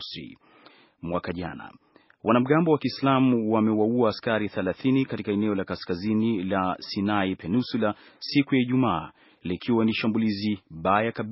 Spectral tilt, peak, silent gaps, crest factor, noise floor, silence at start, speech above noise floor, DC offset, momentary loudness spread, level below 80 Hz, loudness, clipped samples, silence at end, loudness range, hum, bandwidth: -5.5 dB/octave; -6 dBFS; none; 20 dB; -55 dBFS; 0 s; 30 dB; under 0.1%; 12 LU; -60 dBFS; -25 LUFS; under 0.1%; 0 s; 3 LU; none; 5.8 kHz